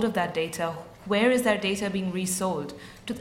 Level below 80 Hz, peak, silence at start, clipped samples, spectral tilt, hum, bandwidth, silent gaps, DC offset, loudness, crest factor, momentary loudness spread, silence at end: -58 dBFS; -10 dBFS; 0 s; under 0.1%; -4 dB/octave; none; 16.5 kHz; none; under 0.1%; -27 LUFS; 18 dB; 15 LU; 0 s